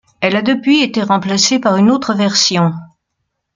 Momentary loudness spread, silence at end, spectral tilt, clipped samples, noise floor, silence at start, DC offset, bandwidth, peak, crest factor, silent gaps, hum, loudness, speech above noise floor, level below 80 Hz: 4 LU; 0.7 s; -4 dB/octave; under 0.1%; -72 dBFS; 0.2 s; under 0.1%; 9.6 kHz; 0 dBFS; 14 dB; none; none; -13 LUFS; 59 dB; -58 dBFS